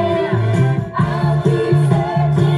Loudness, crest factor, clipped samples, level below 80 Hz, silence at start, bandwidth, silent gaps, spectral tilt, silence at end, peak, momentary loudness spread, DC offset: -16 LUFS; 14 dB; under 0.1%; -42 dBFS; 0 s; 11.5 kHz; none; -8.5 dB/octave; 0 s; -2 dBFS; 3 LU; under 0.1%